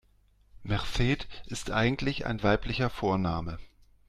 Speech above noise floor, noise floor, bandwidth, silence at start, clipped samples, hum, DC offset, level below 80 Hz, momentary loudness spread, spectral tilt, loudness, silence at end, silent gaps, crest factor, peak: 35 dB; -63 dBFS; 14 kHz; 0.55 s; under 0.1%; none; under 0.1%; -42 dBFS; 11 LU; -6 dB/octave; -30 LUFS; 0.4 s; none; 18 dB; -12 dBFS